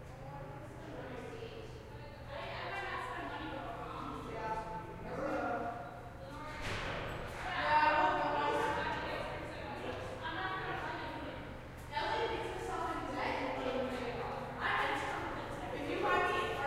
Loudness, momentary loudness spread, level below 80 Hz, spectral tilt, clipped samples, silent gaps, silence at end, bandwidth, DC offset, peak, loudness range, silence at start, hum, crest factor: -38 LUFS; 15 LU; -54 dBFS; -5 dB/octave; under 0.1%; none; 0 s; 16 kHz; under 0.1%; -18 dBFS; 9 LU; 0 s; none; 20 dB